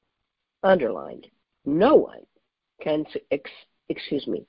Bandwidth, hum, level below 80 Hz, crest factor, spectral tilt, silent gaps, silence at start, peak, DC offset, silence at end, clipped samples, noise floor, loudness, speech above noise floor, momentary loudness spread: 5.4 kHz; none; -60 dBFS; 22 dB; -10.5 dB/octave; none; 0.65 s; -4 dBFS; under 0.1%; 0.05 s; under 0.1%; -81 dBFS; -24 LUFS; 58 dB; 17 LU